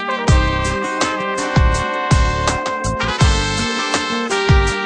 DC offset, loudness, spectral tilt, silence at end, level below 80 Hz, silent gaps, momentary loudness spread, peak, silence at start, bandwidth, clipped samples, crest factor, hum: under 0.1%; -17 LUFS; -4.5 dB/octave; 0 s; -22 dBFS; none; 5 LU; 0 dBFS; 0 s; 10 kHz; under 0.1%; 16 dB; none